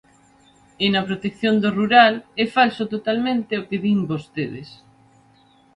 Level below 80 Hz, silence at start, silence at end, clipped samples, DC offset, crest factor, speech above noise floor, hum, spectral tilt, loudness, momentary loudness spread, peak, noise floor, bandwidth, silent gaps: -60 dBFS; 0.8 s; 1 s; under 0.1%; under 0.1%; 20 dB; 35 dB; none; -6.5 dB/octave; -20 LUFS; 13 LU; 0 dBFS; -55 dBFS; 9.8 kHz; none